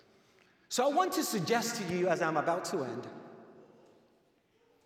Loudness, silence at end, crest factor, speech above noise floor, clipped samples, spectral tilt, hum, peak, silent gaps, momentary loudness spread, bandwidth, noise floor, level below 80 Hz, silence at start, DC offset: -32 LUFS; 1.2 s; 20 dB; 39 dB; under 0.1%; -4 dB/octave; none; -16 dBFS; none; 15 LU; 17 kHz; -70 dBFS; -80 dBFS; 0.7 s; under 0.1%